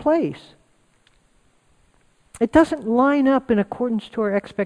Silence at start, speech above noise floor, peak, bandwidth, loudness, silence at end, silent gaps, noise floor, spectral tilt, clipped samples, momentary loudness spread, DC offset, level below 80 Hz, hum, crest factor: 0 s; 41 dB; -2 dBFS; 10.5 kHz; -20 LUFS; 0 s; none; -61 dBFS; -7 dB/octave; under 0.1%; 8 LU; under 0.1%; -50 dBFS; none; 18 dB